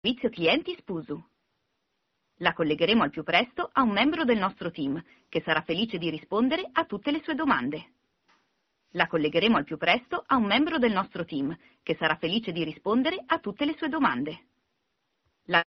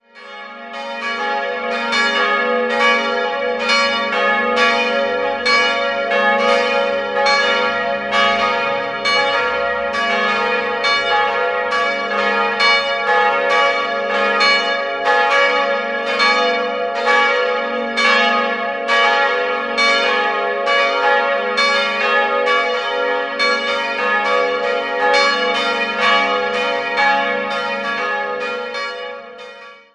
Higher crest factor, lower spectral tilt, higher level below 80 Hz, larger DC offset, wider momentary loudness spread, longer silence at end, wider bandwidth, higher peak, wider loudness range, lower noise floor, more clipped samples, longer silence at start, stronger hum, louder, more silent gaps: first, 24 dB vs 16 dB; about the same, -2.5 dB/octave vs -2 dB/octave; second, -62 dBFS vs -56 dBFS; neither; first, 11 LU vs 7 LU; about the same, 0.1 s vs 0.2 s; second, 6.2 kHz vs 11 kHz; about the same, -4 dBFS vs -2 dBFS; about the same, 3 LU vs 2 LU; first, -78 dBFS vs -38 dBFS; neither; about the same, 0.05 s vs 0.15 s; neither; second, -27 LUFS vs -16 LUFS; neither